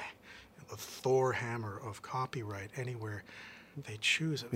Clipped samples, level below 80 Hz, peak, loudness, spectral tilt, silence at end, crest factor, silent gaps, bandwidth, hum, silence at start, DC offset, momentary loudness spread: under 0.1%; -72 dBFS; -18 dBFS; -36 LUFS; -4.5 dB/octave; 0 s; 20 dB; none; 16 kHz; none; 0 s; under 0.1%; 19 LU